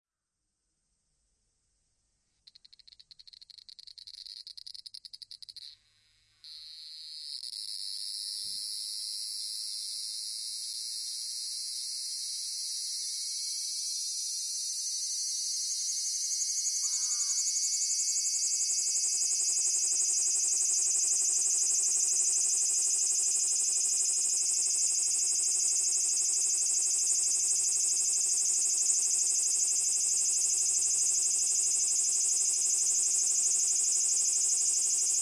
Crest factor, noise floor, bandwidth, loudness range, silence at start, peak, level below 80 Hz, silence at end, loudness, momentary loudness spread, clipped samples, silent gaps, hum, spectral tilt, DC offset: 16 dB; -85 dBFS; 12 kHz; 16 LU; 4.05 s; -14 dBFS; -80 dBFS; 0 s; -27 LUFS; 12 LU; under 0.1%; none; none; 4 dB/octave; under 0.1%